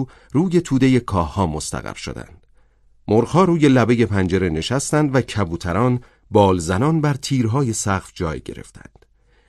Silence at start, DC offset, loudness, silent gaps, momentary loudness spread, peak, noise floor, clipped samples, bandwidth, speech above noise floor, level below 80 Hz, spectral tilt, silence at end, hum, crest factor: 0 s; under 0.1%; -19 LUFS; none; 13 LU; -2 dBFS; -53 dBFS; under 0.1%; 13.5 kHz; 35 dB; -38 dBFS; -6 dB/octave; 0.7 s; none; 18 dB